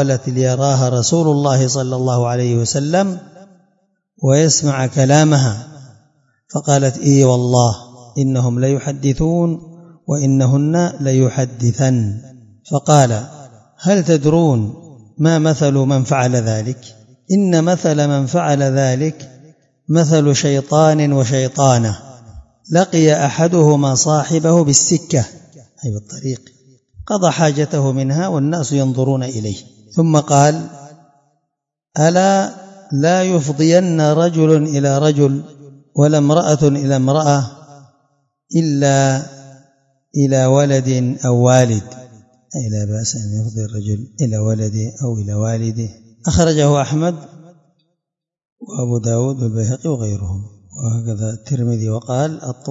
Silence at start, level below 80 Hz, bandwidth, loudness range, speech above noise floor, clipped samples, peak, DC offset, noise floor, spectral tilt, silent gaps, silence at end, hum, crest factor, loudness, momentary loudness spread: 0 s; -48 dBFS; 8 kHz; 6 LU; 67 dB; under 0.1%; 0 dBFS; under 0.1%; -81 dBFS; -6 dB/octave; 48.52-48.56 s; 0 s; none; 16 dB; -15 LUFS; 13 LU